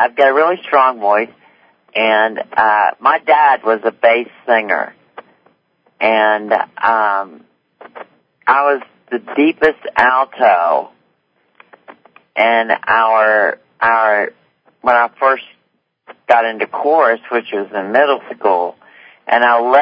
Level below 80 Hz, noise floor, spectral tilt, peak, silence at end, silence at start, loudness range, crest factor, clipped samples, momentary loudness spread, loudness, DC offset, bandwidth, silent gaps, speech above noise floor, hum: -62 dBFS; -64 dBFS; -5.5 dB/octave; 0 dBFS; 0 s; 0 s; 3 LU; 14 dB; under 0.1%; 10 LU; -14 LUFS; under 0.1%; 5.4 kHz; none; 51 dB; none